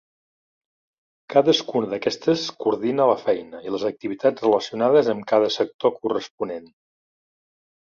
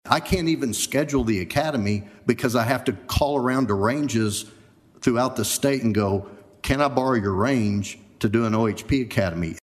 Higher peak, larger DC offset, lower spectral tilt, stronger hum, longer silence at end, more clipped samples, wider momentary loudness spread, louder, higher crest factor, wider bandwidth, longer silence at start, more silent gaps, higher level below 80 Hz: second, -4 dBFS vs 0 dBFS; neither; about the same, -5 dB/octave vs -5 dB/octave; neither; first, 1.2 s vs 0.05 s; neither; first, 9 LU vs 5 LU; about the same, -22 LUFS vs -23 LUFS; about the same, 20 dB vs 22 dB; second, 7.4 kHz vs 14.5 kHz; first, 1.3 s vs 0.05 s; first, 5.74-5.79 s, 6.31-6.38 s vs none; second, -68 dBFS vs -42 dBFS